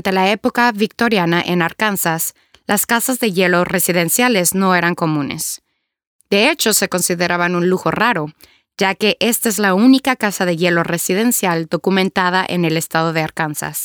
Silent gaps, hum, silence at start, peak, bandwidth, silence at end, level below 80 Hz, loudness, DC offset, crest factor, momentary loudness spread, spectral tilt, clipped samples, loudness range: 6.07-6.19 s; none; 0.05 s; 0 dBFS; over 20 kHz; 0 s; -56 dBFS; -16 LUFS; under 0.1%; 16 dB; 7 LU; -3.5 dB/octave; under 0.1%; 1 LU